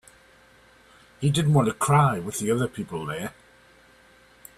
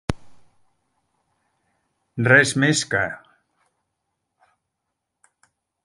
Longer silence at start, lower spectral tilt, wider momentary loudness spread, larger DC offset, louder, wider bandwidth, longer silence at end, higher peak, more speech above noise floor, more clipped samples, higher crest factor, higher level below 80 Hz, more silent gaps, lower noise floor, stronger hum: first, 1.2 s vs 0.1 s; first, -6 dB/octave vs -4 dB/octave; second, 12 LU vs 23 LU; neither; second, -24 LUFS vs -18 LUFS; first, 14 kHz vs 11.5 kHz; second, 1.3 s vs 2.7 s; second, -8 dBFS vs 0 dBFS; second, 32 dB vs 62 dB; neither; second, 20 dB vs 26 dB; second, -56 dBFS vs -50 dBFS; neither; second, -55 dBFS vs -80 dBFS; neither